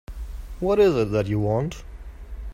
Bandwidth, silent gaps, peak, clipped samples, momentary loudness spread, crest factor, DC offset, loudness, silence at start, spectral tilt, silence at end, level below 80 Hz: 14.5 kHz; none; -8 dBFS; under 0.1%; 22 LU; 16 dB; under 0.1%; -22 LUFS; 0.1 s; -7.5 dB/octave; 0 s; -36 dBFS